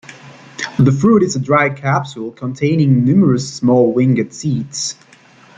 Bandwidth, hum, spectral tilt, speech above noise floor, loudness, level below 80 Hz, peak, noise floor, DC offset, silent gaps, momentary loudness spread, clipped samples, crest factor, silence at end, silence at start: 9.4 kHz; none; -6.5 dB/octave; 31 dB; -15 LUFS; -52 dBFS; -2 dBFS; -45 dBFS; under 0.1%; none; 12 LU; under 0.1%; 14 dB; 0.65 s; 0.1 s